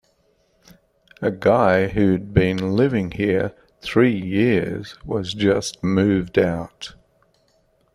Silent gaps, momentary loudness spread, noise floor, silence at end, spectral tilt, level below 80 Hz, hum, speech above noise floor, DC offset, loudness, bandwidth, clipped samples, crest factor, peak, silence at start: none; 11 LU; -63 dBFS; 1.05 s; -6.5 dB/octave; -46 dBFS; none; 43 dB; under 0.1%; -20 LUFS; 13 kHz; under 0.1%; 18 dB; -2 dBFS; 1.2 s